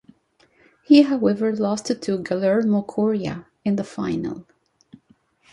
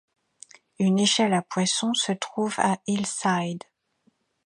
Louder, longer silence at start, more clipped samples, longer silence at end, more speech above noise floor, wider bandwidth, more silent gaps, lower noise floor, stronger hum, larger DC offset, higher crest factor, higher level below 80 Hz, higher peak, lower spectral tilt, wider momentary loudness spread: first, -21 LUFS vs -24 LUFS; about the same, 0.9 s vs 0.8 s; neither; first, 1.1 s vs 0.9 s; second, 40 dB vs 44 dB; about the same, 11 kHz vs 11.5 kHz; neither; second, -60 dBFS vs -68 dBFS; neither; neither; about the same, 20 dB vs 20 dB; first, -60 dBFS vs -72 dBFS; about the same, -4 dBFS vs -6 dBFS; first, -6.5 dB/octave vs -4 dB/octave; first, 13 LU vs 7 LU